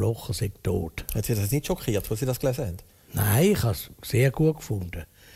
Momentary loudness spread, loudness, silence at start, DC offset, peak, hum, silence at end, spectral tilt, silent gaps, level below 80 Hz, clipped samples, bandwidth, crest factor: 12 LU; -26 LUFS; 0 s; under 0.1%; -10 dBFS; none; 0.3 s; -6 dB/octave; none; -42 dBFS; under 0.1%; 16 kHz; 16 dB